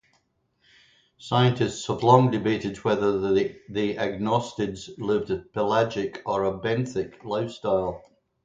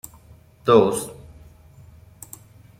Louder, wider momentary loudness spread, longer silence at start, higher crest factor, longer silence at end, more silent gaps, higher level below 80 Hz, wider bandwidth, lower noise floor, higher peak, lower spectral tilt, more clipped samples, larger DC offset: second, -25 LUFS vs -19 LUFS; second, 10 LU vs 26 LU; first, 1.2 s vs 0.65 s; about the same, 24 dB vs 22 dB; second, 0.45 s vs 1.65 s; neither; about the same, -56 dBFS vs -54 dBFS; second, 9.2 kHz vs 16 kHz; first, -70 dBFS vs -50 dBFS; about the same, -2 dBFS vs -4 dBFS; about the same, -6.5 dB/octave vs -5.5 dB/octave; neither; neither